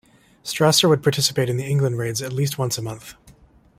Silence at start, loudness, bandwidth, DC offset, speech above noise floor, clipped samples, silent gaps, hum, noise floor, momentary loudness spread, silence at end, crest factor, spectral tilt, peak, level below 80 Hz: 0.45 s; -20 LUFS; 16 kHz; under 0.1%; 31 dB; under 0.1%; none; none; -51 dBFS; 15 LU; 0.5 s; 20 dB; -4.5 dB/octave; -2 dBFS; -56 dBFS